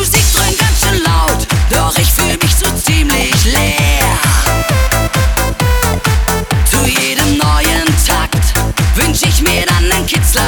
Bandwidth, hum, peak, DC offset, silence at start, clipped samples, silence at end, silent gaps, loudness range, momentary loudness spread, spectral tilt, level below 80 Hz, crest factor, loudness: over 20 kHz; none; 0 dBFS; under 0.1%; 0 s; under 0.1%; 0 s; none; 1 LU; 3 LU; -3.5 dB/octave; -16 dBFS; 10 dB; -11 LUFS